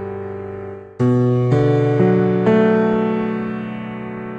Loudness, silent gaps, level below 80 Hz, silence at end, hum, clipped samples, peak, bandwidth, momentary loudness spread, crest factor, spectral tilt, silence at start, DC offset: -17 LUFS; none; -50 dBFS; 0 s; none; under 0.1%; -2 dBFS; 7.4 kHz; 14 LU; 14 dB; -9.5 dB/octave; 0 s; under 0.1%